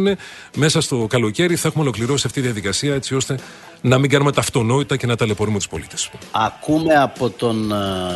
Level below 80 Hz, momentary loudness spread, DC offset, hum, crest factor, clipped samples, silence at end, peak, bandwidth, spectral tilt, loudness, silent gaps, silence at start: -48 dBFS; 9 LU; under 0.1%; none; 18 dB; under 0.1%; 0 s; -2 dBFS; 12.5 kHz; -5 dB/octave; -19 LUFS; none; 0 s